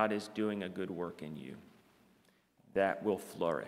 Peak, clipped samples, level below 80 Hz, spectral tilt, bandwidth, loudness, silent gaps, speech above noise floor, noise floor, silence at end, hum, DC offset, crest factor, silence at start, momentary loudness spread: -14 dBFS; under 0.1%; -76 dBFS; -6 dB/octave; 16 kHz; -37 LUFS; none; 34 dB; -70 dBFS; 0 s; none; under 0.1%; 22 dB; 0 s; 14 LU